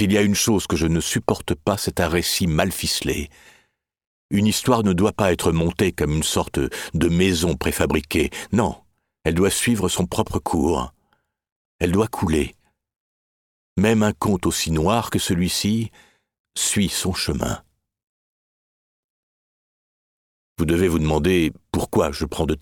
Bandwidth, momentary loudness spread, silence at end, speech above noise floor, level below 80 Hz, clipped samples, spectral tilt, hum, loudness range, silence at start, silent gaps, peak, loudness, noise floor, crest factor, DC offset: 19 kHz; 7 LU; 0 s; 47 dB; -38 dBFS; under 0.1%; -4.5 dB/octave; none; 5 LU; 0 s; 4.07-4.29 s, 11.52-11.79 s, 12.96-13.76 s, 16.39-16.44 s, 18.03-20.56 s; -2 dBFS; -21 LUFS; -68 dBFS; 20 dB; under 0.1%